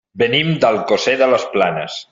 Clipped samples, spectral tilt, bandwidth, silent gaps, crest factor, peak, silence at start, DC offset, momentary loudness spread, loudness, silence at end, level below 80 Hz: under 0.1%; -5 dB/octave; 7.8 kHz; none; 16 dB; 0 dBFS; 0.15 s; under 0.1%; 4 LU; -16 LUFS; 0.1 s; -56 dBFS